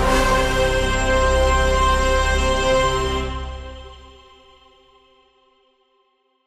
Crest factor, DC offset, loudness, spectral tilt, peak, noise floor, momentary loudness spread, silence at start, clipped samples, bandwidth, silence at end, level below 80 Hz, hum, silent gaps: 16 dB; under 0.1%; -19 LUFS; -4 dB/octave; -4 dBFS; -65 dBFS; 14 LU; 0 s; under 0.1%; 15 kHz; 2.45 s; -26 dBFS; none; none